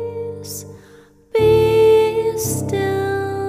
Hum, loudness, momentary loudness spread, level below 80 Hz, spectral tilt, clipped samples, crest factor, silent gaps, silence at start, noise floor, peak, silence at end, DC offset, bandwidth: none; -16 LUFS; 16 LU; -42 dBFS; -5 dB/octave; under 0.1%; 14 dB; none; 0 s; -47 dBFS; -4 dBFS; 0 s; under 0.1%; 16 kHz